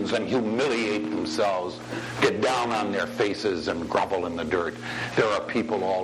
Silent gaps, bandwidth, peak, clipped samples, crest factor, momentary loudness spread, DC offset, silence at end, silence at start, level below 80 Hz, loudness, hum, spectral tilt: none; 13 kHz; -6 dBFS; under 0.1%; 20 dB; 5 LU; under 0.1%; 0 s; 0 s; -58 dBFS; -26 LUFS; none; -4.5 dB/octave